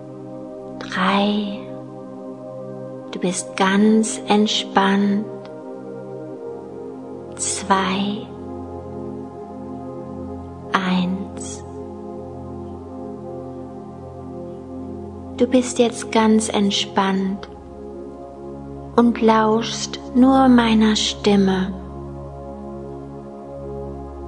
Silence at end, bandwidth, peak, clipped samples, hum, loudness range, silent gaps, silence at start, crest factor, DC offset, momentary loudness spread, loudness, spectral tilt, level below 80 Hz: 0 s; 11 kHz; 0 dBFS; under 0.1%; none; 10 LU; none; 0 s; 22 dB; under 0.1%; 18 LU; -19 LUFS; -4.5 dB/octave; -46 dBFS